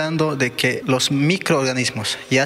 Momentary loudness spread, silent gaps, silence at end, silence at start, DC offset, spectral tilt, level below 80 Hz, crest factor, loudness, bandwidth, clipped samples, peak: 3 LU; none; 0 s; 0 s; under 0.1%; -4 dB/octave; -60 dBFS; 14 dB; -19 LUFS; 16 kHz; under 0.1%; -4 dBFS